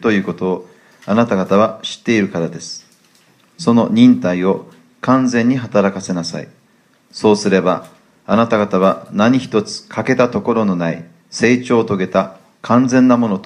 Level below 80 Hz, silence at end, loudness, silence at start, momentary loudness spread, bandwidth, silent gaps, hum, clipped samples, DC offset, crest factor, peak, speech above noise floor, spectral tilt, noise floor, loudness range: -58 dBFS; 0 s; -15 LUFS; 0 s; 13 LU; 10.5 kHz; none; none; under 0.1%; under 0.1%; 16 dB; 0 dBFS; 40 dB; -6 dB/octave; -54 dBFS; 3 LU